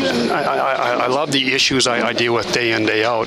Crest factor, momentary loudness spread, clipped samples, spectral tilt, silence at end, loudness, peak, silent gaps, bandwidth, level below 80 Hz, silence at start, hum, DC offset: 16 dB; 4 LU; under 0.1%; -3 dB/octave; 0 s; -16 LUFS; -2 dBFS; none; 15.5 kHz; -52 dBFS; 0 s; none; under 0.1%